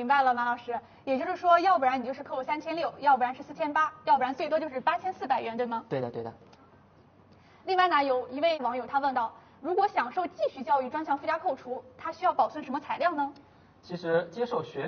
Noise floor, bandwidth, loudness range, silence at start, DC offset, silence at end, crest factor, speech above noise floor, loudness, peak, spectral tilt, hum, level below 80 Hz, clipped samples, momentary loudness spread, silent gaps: -58 dBFS; 6.6 kHz; 4 LU; 0 s; under 0.1%; 0 s; 18 dB; 30 dB; -29 LUFS; -10 dBFS; -2.5 dB/octave; none; -74 dBFS; under 0.1%; 12 LU; none